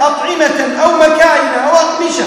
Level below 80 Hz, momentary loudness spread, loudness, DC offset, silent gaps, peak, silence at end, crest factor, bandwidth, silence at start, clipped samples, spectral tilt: -48 dBFS; 5 LU; -10 LUFS; under 0.1%; none; 0 dBFS; 0 s; 10 dB; 14.5 kHz; 0 s; 0.9%; -2 dB/octave